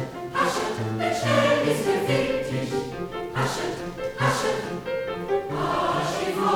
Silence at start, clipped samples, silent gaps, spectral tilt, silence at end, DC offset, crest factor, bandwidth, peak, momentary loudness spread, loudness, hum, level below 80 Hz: 0 s; under 0.1%; none; -5 dB/octave; 0 s; under 0.1%; 16 dB; over 20 kHz; -8 dBFS; 8 LU; -25 LUFS; none; -50 dBFS